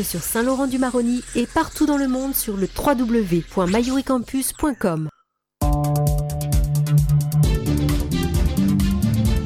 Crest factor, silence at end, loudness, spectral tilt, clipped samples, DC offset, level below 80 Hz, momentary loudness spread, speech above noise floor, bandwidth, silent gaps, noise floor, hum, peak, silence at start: 12 dB; 0 s; -21 LUFS; -6 dB/octave; under 0.1%; under 0.1%; -28 dBFS; 4 LU; 21 dB; 18 kHz; none; -41 dBFS; none; -8 dBFS; 0 s